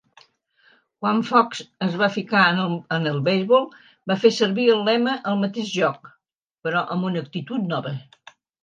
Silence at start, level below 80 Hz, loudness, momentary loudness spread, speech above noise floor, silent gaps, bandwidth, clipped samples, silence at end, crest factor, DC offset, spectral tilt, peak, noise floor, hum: 1 s; -74 dBFS; -21 LUFS; 10 LU; 42 dB; 6.35-6.48 s; 9.2 kHz; under 0.1%; 0.6 s; 20 dB; under 0.1%; -6 dB/octave; -2 dBFS; -63 dBFS; none